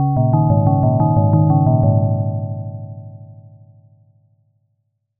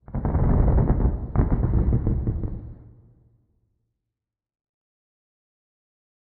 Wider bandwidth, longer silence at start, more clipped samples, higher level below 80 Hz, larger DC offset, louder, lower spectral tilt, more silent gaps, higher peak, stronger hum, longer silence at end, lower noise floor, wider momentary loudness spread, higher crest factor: second, 1.4 kHz vs 2.4 kHz; about the same, 0 s vs 0.1 s; neither; second, -42 dBFS vs -28 dBFS; neither; first, -16 LUFS vs -24 LUFS; second, -6.5 dB/octave vs -12.5 dB/octave; neither; first, -2 dBFS vs -6 dBFS; neither; second, 1.85 s vs 3.45 s; second, -69 dBFS vs -86 dBFS; first, 18 LU vs 12 LU; about the same, 14 dB vs 18 dB